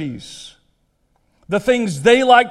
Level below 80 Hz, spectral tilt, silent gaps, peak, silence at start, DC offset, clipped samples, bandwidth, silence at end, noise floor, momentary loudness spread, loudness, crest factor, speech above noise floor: -52 dBFS; -4.5 dB/octave; none; 0 dBFS; 0 s; under 0.1%; under 0.1%; 12.5 kHz; 0 s; -63 dBFS; 23 LU; -15 LUFS; 18 dB; 48 dB